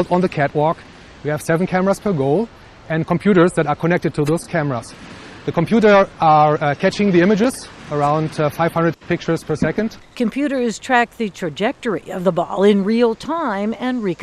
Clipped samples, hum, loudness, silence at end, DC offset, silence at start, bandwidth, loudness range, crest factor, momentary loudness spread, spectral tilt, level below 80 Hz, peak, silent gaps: under 0.1%; none; -18 LUFS; 0 s; under 0.1%; 0 s; 13.5 kHz; 4 LU; 16 dB; 10 LU; -6.5 dB/octave; -48 dBFS; -2 dBFS; none